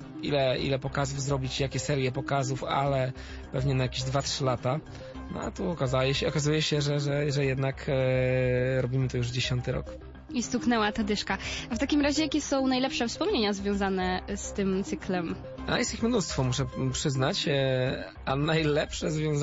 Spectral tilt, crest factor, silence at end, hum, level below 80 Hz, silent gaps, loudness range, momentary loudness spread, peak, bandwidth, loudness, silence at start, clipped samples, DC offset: -5 dB/octave; 16 dB; 0 s; none; -46 dBFS; none; 2 LU; 7 LU; -12 dBFS; 8 kHz; -28 LUFS; 0 s; under 0.1%; under 0.1%